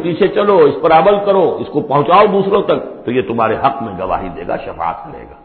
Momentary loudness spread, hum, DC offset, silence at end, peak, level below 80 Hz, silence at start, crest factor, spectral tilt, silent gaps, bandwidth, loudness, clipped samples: 12 LU; none; under 0.1%; 0.1 s; 0 dBFS; -42 dBFS; 0 s; 14 dB; -11 dB/octave; none; 4.5 kHz; -13 LUFS; under 0.1%